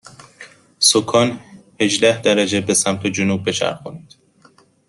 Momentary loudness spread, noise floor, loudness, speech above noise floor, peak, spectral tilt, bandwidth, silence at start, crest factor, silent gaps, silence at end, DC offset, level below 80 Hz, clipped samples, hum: 9 LU; -53 dBFS; -16 LUFS; 35 dB; 0 dBFS; -3 dB/octave; 12.5 kHz; 0.05 s; 20 dB; none; 0.9 s; under 0.1%; -60 dBFS; under 0.1%; none